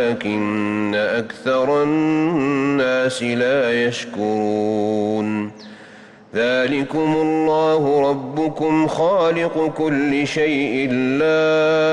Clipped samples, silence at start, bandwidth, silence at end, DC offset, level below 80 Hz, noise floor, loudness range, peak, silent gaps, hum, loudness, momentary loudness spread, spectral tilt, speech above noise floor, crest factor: under 0.1%; 0 s; 11 kHz; 0 s; under 0.1%; -58 dBFS; -43 dBFS; 3 LU; -8 dBFS; none; none; -19 LUFS; 5 LU; -6 dB/octave; 25 dB; 10 dB